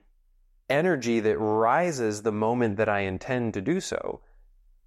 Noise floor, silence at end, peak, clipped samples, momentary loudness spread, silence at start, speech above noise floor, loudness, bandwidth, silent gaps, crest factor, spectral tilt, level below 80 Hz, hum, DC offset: -62 dBFS; 0.7 s; -10 dBFS; under 0.1%; 7 LU; 0.7 s; 37 dB; -26 LUFS; 13 kHz; none; 16 dB; -5.5 dB/octave; -58 dBFS; none; under 0.1%